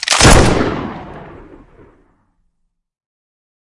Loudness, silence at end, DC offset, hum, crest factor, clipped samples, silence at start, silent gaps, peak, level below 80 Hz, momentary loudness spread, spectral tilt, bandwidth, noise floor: -11 LUFS; 2.45 s; under 0.1%; none; 16 dB; 0.3%; 0 s; none; 0 dBFS; -24 dBFS; 25 LU; -3.5 dB/octave; 12 kHz; -67 dBFS